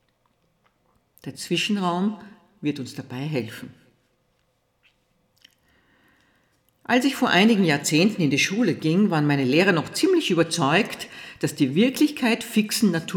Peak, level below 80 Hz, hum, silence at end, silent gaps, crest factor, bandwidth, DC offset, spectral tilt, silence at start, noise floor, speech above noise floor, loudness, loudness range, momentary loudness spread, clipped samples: -6 dBFS; -70 dBFS; none; 0 s; none; 18 dB; 19.5 kHz; under 0.1%; -4.5 dB/octave; 1.25 s; -69 dBFS; 47 dB; -22 LUFS; 14 LU; 15 LU; under 0.1%